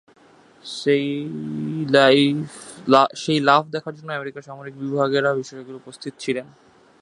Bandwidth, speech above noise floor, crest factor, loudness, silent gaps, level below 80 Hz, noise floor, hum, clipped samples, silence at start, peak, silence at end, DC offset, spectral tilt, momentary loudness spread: 11 kHz; 31 dB; 22 dB; -20 LUFS; none; -68 dBFS; -52 dBFS; none; under 0.1%; 0.65 s; 0 dBFS; 0.6 s; under 0.1%; -5.5 dB/octave; 19 LU